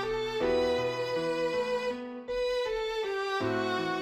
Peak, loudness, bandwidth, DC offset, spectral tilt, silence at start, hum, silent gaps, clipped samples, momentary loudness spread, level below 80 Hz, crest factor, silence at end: -16 dBFS; -31 LUFS; 15 kHz; under 0.1%; -5 dB/octave; 0 s; none; none; under 0.1%; 5 LU; -56 dBFS; 14 dB; 0 s